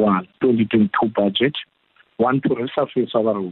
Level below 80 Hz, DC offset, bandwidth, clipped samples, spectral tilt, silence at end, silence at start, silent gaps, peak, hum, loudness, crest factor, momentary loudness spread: -58 dBFS; under 0.1%; 4.2 kHz; under 0.1%; -10.5 dB/octave; 0 s; 0 s; none; -6 dBFS; none; -20 LUFS; 12 dB; 5 LU